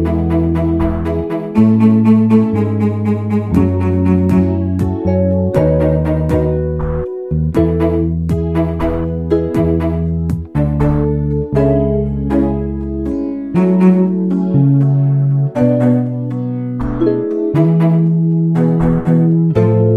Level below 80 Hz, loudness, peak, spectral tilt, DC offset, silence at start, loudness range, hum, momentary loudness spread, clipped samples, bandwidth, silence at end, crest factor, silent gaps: -28 dBFS; -14 LUFS; 0 dBFS; -10.5 dB/octave; 0.2%; 0 s; 3 LU; none; 8 LU; under 0.1%; 4.7 kHz; 0 s; 12 dB; none